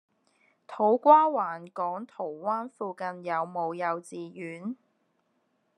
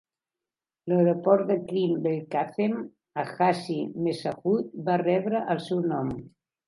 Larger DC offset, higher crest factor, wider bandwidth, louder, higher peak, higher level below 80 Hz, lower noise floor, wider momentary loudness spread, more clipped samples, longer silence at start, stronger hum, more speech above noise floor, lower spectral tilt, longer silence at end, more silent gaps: neither; about the same, 22 dB vs 18 dB; about the same, 10.5 kHz vs 11.5 kHz; about the same, -27 LUFS vs -27 LUFS; about the same, -6 dBFS vs -8 dBFS; second, under -90 dBFS vs -64 dBFS; second, -74 dBFS vs under -90 dBFS; first, 19 LU vs 11 LU; neither; second, 0.7 s vs 0.85 s; neither; second, 46 dB vs over 64 dB; second, -6.5 dB/octave vs -8 dB/octave; first, 1.05 s vs 0.4 s; neither